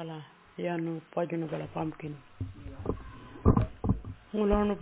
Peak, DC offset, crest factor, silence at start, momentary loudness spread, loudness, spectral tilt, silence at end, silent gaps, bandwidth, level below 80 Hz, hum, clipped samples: -8 dBFS; under 0.1%; 24 dB; 0 s; 16 LU; -33 LUFS; -8 dB/octave; 0 s; none; 4 kHz; -40 dBFS; none; under 0.1%